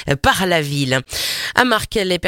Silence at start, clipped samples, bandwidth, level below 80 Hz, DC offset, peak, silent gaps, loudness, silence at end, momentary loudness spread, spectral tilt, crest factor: 0 s; under 0.1%; 17 kHz; -38 dBFS; under 0.1%; 0 dBFS; none; -17 LUFS; 0 s; 4 LU; -4 dB/octave; 18 dB